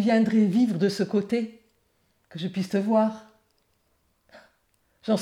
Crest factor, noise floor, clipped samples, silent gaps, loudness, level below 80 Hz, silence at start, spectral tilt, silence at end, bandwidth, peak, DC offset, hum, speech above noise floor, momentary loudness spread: 16 dB; -70 dBFS; under 0.1%; none; -25 LUFS; -74 dBFS; 0 s; -7 dB/octave; 0 s; 11.5 kHz; -10 dBFS; under 0.1%; none; 46 dB; 16 LU